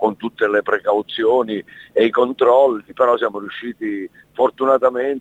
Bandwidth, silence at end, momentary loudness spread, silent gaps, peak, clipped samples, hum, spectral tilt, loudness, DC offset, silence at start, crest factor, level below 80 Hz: 7.8 kHz; 0 s; 12 LU; none; -2 dBFS; under 0.1%; none; -6 dB/octave; -18 LUFS; under 0.1%; 0 s; 14 dB; -62 dBFS